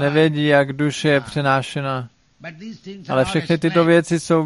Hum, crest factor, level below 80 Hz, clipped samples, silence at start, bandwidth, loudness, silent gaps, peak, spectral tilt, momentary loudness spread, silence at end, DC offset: none; 16 dB; -54 dBFS; under 0.1%; 0 s; 11.5 kHz; -18 LUFS; none; -2 dBFS; -6 dB/octave; 20 LU; 0 s; under 0.1%